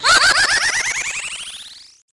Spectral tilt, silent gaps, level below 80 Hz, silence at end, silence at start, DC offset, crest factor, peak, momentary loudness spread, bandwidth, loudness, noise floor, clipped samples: 1.5 dB/octave; none; -46 dBFS; 0.35 s; 0 s; under 0.1%; 14 dB; -4 dBFS; 20 LU; 11.5 kHz; -15 LUFS; -38 dBFS; under 0.1%